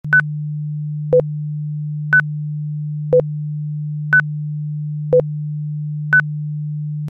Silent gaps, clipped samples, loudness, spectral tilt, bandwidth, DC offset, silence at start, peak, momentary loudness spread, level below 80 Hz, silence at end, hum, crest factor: none; under 0.1%; -19 LUFS; -10 dB/octave; 3.6 kHz; under 0.1%; 0.05 s; -4 dBFS; 9 LU; -54 dBFS; 0 s; none; 14 dB